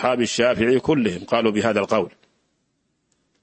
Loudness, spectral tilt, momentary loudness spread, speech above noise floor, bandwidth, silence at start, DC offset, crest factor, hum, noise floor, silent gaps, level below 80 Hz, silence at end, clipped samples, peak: -20 LUFS; -5 dB/octave; 4 LU; 51 dB; 8.8 kHz; 0 s; under 0.1%; 18 dB; none; -71 dBFS; none; -54 dBFS; 1.35 s; under 0.1%; -4 dBFS